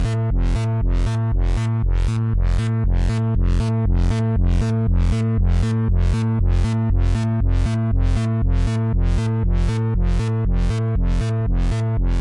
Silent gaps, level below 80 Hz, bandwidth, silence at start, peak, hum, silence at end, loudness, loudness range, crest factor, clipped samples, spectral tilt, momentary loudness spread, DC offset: none; -20 dBFS; 10.5 kHz; 0 s; -10 dBFS; none; 0 s; -21 LUFS; 1 LU; 8 dB; under 0.1%; -8 dB/octave; 2 LU; under 0.1%